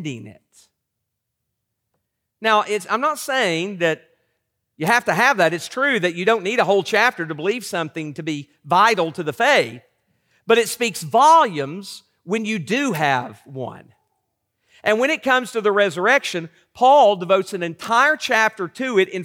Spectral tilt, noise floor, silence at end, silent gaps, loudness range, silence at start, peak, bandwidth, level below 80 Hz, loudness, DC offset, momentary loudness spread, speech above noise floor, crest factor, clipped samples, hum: -4 dB/octave; -78 dBFS; 0 s; none; 6 LU; 0 s; -4 dBFS; 17.5 kHz; -72 dBFS; -18 LUFS; under 0.1%; 14 LU; 59 dB; 16 dB; under 0.1%; none